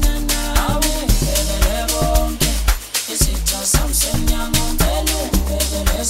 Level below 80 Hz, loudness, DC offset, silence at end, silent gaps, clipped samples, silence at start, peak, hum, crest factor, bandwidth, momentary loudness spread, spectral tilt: -20 dBFS; -18 LUFS; under 0.1%; 0 s; none; under 0.1%; 0 s; 0 dBFS; none; 16 dB; 16.5 kHz; 3 LU; -3.5 dB/octave